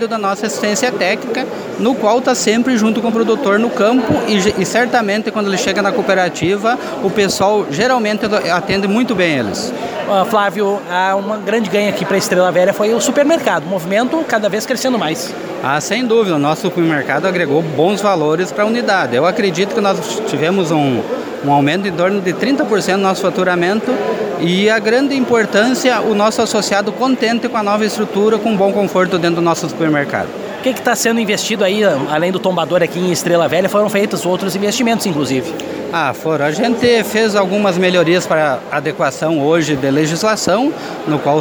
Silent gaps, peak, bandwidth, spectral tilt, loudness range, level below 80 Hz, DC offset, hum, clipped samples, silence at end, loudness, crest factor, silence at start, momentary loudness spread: none; 0 dBFS; over 20 kHz; -4.5 dB/octave; 2 LU; -54 dBFS; under 0.1%; none; under 0.1%; 0 s; -14 LUFS; 14 dB; 0 s; 5 LU